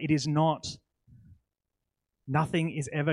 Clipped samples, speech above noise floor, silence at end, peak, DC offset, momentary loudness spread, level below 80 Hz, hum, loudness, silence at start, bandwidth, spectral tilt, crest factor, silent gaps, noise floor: under 0.1%; 57 dB; 0 s; -12 dBFS; under 0.1%; 12 LU; -64 dBFS; none; -29 LUFS; 0 s; 11.5 kHz; -6 dB/octave; 18 dB; none; -85 dBFS